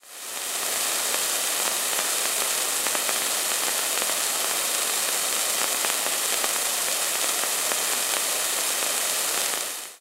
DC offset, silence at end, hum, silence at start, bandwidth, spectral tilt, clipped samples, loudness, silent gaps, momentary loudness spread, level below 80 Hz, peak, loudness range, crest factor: under 0.1%; 0.05 s; none; 0.05 s; 16 kHz; 2 dB/octave; under 0.1%; -23 LUFS; none; 1 LU; -66 dBFS; -2 dBFS; 0 LU; 22 dB